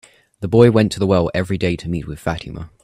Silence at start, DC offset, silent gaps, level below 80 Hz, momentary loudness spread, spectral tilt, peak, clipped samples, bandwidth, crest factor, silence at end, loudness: 0.4 s; under 0.1%; none; -42 dBFS; 15 LU; -7 dB/octave; 0 dBFS; under 0.1%; 14 kHz; 18 dB; 0.15 s; -17 LUFS